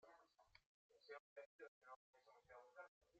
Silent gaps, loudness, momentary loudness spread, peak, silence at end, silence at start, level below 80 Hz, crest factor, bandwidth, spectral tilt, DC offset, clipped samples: 0.66-0.89 s, 1.20-1.36 s, 1.46-1.59 s, 1.68-1.81 s, 1.96-2.13 s, 2.88-3.01 s; -64 LUFS; 6 LU; -46 dBFS; 0 s; 0 s; under -90 dBFS; 20 dB; 7.6 kHz; -0.5 dB/octave; under 0.1%; under 0.1%